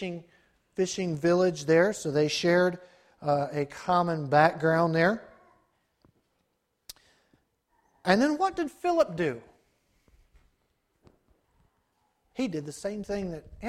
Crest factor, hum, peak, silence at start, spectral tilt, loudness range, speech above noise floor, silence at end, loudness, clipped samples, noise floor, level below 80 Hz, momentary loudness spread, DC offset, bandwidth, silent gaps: 24 dB; none; -6 dBFS; 0 s; -5.5 dB/octave; 13 LU; 50 dB; 0 s; -27 LUFS; under 0.1%; -77 dBFS; -62 dBFS; 15 LU; under 0.1%; 14.5 kHz; none